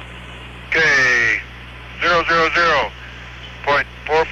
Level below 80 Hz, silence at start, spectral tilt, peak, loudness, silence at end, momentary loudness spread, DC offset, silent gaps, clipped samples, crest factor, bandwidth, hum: -40 dBFS; 0 s; -3 dB/octave; -6 dBFS; -16 LUFS; 0 s; 22 LU; under 0.1%; none; under 0.1%; 12 dB; 12 kHz; 60 Hz at -40 dBFS